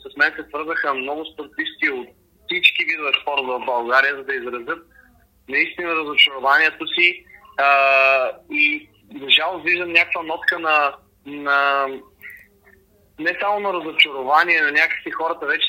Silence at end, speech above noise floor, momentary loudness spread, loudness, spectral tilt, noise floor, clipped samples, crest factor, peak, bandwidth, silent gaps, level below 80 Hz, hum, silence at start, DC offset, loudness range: 0 s; 35 dB; 13 LU; -18 LUFS; -3 dB/octave; -54 dBFS; under 0.1%; 20 dB; 0 dBFS; 16 kHz; none; -62 dBFS; none; 0.05 s; under 0.1%; 5 LU